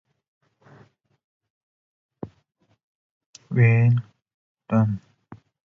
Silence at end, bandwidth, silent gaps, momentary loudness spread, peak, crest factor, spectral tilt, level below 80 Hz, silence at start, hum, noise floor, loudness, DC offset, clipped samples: 0.45 s; 7 kHz; 2.83-3.33 s, 4.34-4.55 s; 24 LU; -8 dBFS; 18 dB; -9.5 dB/octave; -58 dBFS; 2.25 s; none; -67 dBFS; -21 LUFS; under 0.1%; under 0.1%